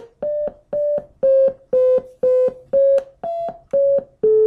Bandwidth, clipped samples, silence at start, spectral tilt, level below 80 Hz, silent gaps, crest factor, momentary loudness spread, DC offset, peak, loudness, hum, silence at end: 3.6 kHz; under 0.1%; 0 s; -8 dB/octave; -56 dBFS; none; 10 dB; 10 LU; under 0.1%; -8 dBFS; -19 LUFS; none; 0 s